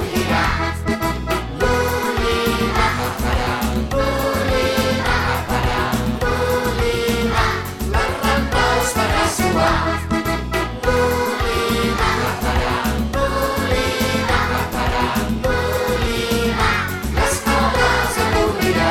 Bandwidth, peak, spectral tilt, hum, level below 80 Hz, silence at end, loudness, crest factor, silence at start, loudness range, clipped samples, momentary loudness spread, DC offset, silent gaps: 18 kHz; -4 dBFS; -4.5 dB/octave; none; -26 dBFS; 0 s; -19 LUFS; 16 dB; 0 s; 1 LU; under 0.1%; 4 LU; under 0.1%; none